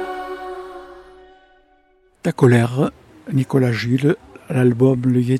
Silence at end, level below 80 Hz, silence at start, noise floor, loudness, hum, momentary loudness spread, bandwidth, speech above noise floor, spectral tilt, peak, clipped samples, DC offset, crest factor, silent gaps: 0 s; -54 dBFS; 0 s; -57 dBFS; -18 LUFS; none; 18 LU; 13 kHz; 41 dB; -8 dB/octave; -2 dBFS; under 0.1%; under 0.1%; 18 dB; none